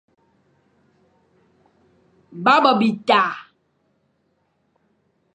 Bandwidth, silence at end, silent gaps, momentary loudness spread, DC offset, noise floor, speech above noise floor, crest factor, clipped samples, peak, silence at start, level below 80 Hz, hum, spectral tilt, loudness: 9 kHz; 1.95 s; none; 18 LU; under 0.1%; -67 dBFS; 50 dB; 22 dB; under 0.1%; -2 dBFS; 2.35 s; -74 dBFS; none; -5.5 dB/octave; -17 LUFS